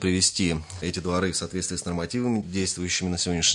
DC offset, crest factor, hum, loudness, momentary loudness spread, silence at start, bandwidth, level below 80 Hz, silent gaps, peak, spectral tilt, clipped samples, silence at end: under 0.1%; 18 dB; none; -26 LUFS; 8 LU; 0 s; 11 kHz; -52 dBFS; none; -8 dBFS; -3.5 dB/octave; under 0.1%; 0 s